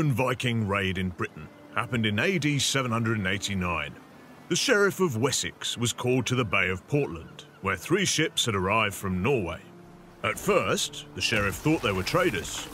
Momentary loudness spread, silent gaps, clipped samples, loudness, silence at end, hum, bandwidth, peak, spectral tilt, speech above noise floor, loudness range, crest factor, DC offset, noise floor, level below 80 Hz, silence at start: 8 LU; none; under 0.1%; -26 LUFS; 0 s; none; 16 kHz; -8 dBFS; -4 dB/octave; 22 dB; 1 LU; 20 dB; under 0.1%; -49 dBFS; -52 dBFS; 0 s